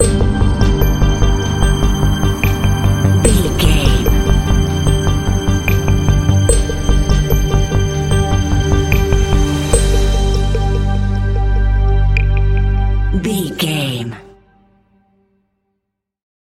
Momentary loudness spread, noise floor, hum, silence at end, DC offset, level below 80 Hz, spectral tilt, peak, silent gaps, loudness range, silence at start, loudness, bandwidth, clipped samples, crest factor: 4 LU; -74 dBFS; none; 2.3 s; 0.4%; -16 dBFS; -5.5 dB/octave; 0 dBFS; none; 5 LU; 0 s; -15 LUFS; 14 kHz; under 0.1%; 14 dB